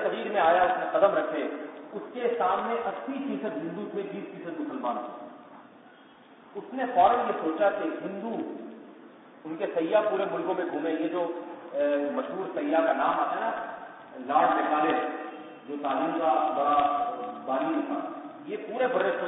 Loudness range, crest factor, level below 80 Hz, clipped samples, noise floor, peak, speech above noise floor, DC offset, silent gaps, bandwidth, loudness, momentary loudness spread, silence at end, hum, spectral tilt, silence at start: 5 LU; 20 dB; -72 dBFS; under 0.1%; -53 dBFS; -8 dBFS; 26 dB; under 0.1%; none; 4 kHz; -28 LUFS; 16 LU; 0 s; none; -9 dB/octave; 0 s